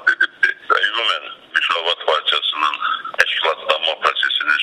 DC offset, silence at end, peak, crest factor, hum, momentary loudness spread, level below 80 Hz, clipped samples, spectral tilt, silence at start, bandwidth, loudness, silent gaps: under 0.1%; 0 s; 0 dBFS; 18 dB; none; 4 LU; -66 dBFS; under 0.1%; 0.5 dB/octave; 0 s; 15 kHz; -17 LUFS; none